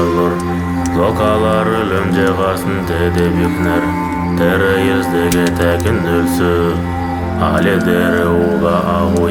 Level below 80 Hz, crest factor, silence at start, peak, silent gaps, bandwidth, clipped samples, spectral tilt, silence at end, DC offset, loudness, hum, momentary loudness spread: -32 dBFS; 12 dB; 0 s; 0 dBFS; none; 18.5 kHz; under 0.1%; -6.5 dB/octave; 0 s; under 0.1%; -14 LUFS; none; 5 LU